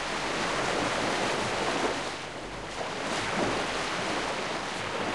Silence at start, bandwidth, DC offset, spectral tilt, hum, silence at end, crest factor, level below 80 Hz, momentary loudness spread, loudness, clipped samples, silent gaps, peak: 0 s; 13 kHz; 0.2%; -3 dB/octave; none; 0 s; 16 dB; -54 dBFS; 7 LU; -30 LUFS; under 0.1%; none; -16 dBFS